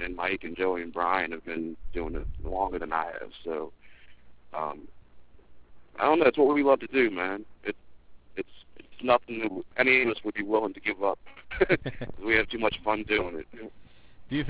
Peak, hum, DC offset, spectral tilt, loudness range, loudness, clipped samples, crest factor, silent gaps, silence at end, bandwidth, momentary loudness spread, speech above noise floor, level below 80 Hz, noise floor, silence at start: -8 dBFS; none; 0.4%; -8.5 dB/octave; 8 LU; -28 LUFS; under 0.1%; 20 dB; none; 0 s; 4 kHz; 17 LU; 25 dB; -48 dBFS; -53 dBFS; 0 s